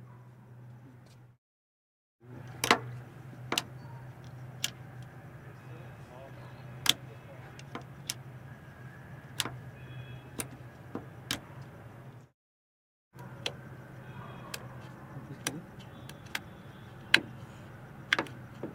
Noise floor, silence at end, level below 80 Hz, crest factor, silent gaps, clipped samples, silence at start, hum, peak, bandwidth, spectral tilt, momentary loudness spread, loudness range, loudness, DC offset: under -90 dBFS; 0 s; -66 dBFS; 40 dB; 1.38-2.19 s, 12.34-13.11 s; under 0.1%; 0 s; none; 0 dBFS; 16.5 kHz; -2.5 dB/octave; 21 LU; 9 LU; -35 LUFS; under 0.1%